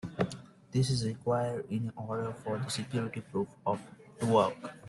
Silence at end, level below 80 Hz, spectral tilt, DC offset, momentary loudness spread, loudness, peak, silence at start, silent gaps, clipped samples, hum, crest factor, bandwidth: 0 s; -64 dBFS; -6 dB/octave; under 0.1%; 9 LU; -33 LUFS; -14 dBFS; 0.05 s; none; under 0.1%; none; 20 dB; 12 kHz